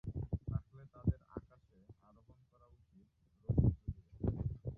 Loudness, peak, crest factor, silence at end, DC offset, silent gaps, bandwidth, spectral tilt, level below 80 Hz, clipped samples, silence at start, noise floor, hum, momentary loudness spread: -40 LUFS; -18 dBFS; 22 dB; 0 s; under 0.1%; none; 1.8 kHz; -13.5 dB/octave; -48 dBFS; under 0.1%; 0.05 s; -69 dBFS; none; 18 LU